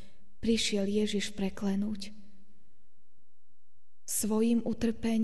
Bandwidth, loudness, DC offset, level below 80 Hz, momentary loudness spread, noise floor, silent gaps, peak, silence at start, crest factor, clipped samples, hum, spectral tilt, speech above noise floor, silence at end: 12 kHz; -31 LUFS; 1%; -54 dBFS; 9 LU; -81 dBFS; none; -16 dBFS; 0.45 s; 16 dB; under 0.1%; none; -4.5 dB/octave; 51 dB; 0 s